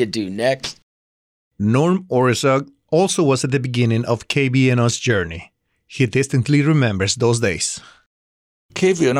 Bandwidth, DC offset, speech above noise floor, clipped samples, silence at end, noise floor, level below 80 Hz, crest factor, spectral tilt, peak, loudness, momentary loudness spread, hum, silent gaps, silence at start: 13 kHz; under 0.1%; over 73 dB; under 0.1%; 0 s; under -90 dBFS; -52 dBFS; 12 dB; -5.5 dB/octave; -6 dBFS; -18 LUFS; 8 LU; none; 0.83-1.51 s, 8.06-8.69 s; 0 s